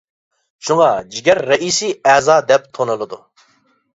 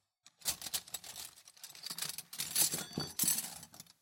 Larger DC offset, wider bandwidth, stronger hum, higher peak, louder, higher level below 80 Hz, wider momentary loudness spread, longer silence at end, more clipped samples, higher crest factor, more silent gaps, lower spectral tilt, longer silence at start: neither; second, 8 kHz vs 17 kHz; neither; first, 0 dBFS vs -14 dBFS; first, -15 LUFS vs -36 LUFS; first, -58 dBFS vs -74 dBFS; second, 13 LU vs 19 LU; first, 0.8 s vs 0.2 s; neither; second, 16 dB vs 26 dB; neither; first, -3 dB/octave vs -0.5 dB/octave; first, 0.65 s vs 0.25 s